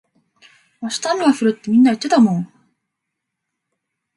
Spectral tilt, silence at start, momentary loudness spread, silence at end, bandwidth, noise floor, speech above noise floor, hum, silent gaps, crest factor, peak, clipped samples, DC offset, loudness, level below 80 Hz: -5 dB/octave; 0.8 s; 12 LU; 1.7 s; 11.5 kHz; -79 dBFS; 63 dB; none; none; 16 dB; -4 dBFS; under 0.1%; under 0.1%; -16 LUFS; -66 dBFS